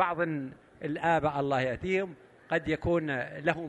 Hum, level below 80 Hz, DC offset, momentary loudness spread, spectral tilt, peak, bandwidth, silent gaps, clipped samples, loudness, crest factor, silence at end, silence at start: none; -54 dBFS; under 0.1%; 10 LU; -7 dB/octave; -10 dBFS; 9.8 kHz; none; under 0.1%; -30 LUFS; 20 dB; 0 s; 0 s